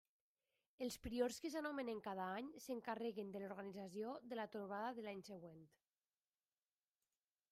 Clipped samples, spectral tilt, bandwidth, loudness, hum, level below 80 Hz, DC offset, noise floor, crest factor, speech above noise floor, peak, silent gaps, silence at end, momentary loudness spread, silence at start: under 0.1%; -4.5 dB/octave; 15 kHz; -48 LUFS; none; -74 dBFS; under 0.1%; under -90 dBFS; 22 dB; over 42 dB; -28 dBFS; none; 1.85 s; 9 LU; 0.8 s